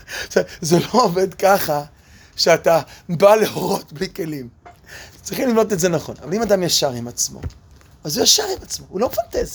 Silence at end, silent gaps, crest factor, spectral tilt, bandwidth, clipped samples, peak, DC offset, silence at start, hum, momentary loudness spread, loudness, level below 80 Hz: 0 s; none; 20 dB; -3.5 dB/octave; over 20 kHz; under 0.1%; 0 dBFS; under 0.1%; 0.1 s; none; 19 LU; -18 LUFS; -46 dBFS